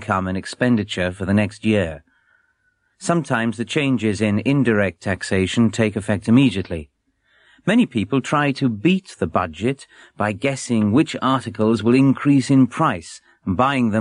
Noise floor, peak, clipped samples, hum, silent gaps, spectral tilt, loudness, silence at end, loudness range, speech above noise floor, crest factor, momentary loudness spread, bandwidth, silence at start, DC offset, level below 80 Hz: -66 dBFS; -4 dBFS; under 0.1%; none; none; -6 dB/octave; -19 LUFS; 0 s; 4 LU; 47 dB; 16 dB; 10 LU; 11 kHz; 0 s; under 0.1%; -50 dBFS